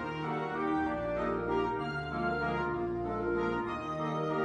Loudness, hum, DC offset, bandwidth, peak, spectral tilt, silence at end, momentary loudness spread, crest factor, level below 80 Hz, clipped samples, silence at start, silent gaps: -33 LUFS; none; under 0.1%; 9.8 kHz; -20 dBFS; -7.5 dB/octave; 0 s; 3 LU; 14 dB; -52 dBFS; under 0.1%; 0 s; none